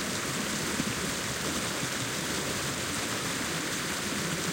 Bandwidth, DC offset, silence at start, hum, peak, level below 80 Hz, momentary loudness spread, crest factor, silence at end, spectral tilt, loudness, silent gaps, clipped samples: 16.5 kHz; under 0.1%; 0 s; none; -16 dBFS; -56 dBFS; 1 LU; 16 dB; 0 s; -2.5 dB/octave; -30 LUFS; none; under 0.1%